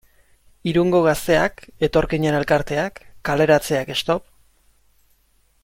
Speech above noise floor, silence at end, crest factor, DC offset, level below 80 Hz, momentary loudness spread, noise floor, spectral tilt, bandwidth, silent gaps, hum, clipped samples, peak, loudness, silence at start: 42 dB; 1.4 s; 16 dB; under 0.1%; -42 dBFS; 8 LU; -61 dBFS; -5.5 dB/octave; 16.5 kHz; none; none; under 0.1%; -4 dBFS; -20 LUFS; 0.65 s